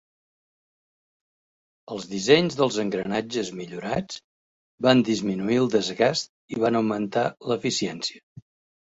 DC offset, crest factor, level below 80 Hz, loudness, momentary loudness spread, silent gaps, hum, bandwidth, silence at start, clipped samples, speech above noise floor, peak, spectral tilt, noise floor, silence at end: under 0.1%; 22 dB; -62 dBFS; -24 LUFS; 13 LU; 4.24-4.78 s, 6.29-6.48 s, 8.23-8.36 s; none; 8 kHz; 1.9 s; under 0.1%; over 66 dB; -4 dBFS; -4.5 dB/octave; under -90 dBFS; 0.4 s